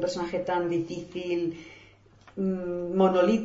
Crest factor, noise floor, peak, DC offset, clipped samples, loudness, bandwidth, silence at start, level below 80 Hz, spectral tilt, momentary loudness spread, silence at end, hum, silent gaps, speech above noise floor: 18 dB; -55 dBFS; -10 dBFS; under 0.1%; under 0.1%; -28 LUFS; 7.8 kHz; 0 s; -60 dBFS; -7 dB/octave; 15 LU; 0 s; none; none; 29 dB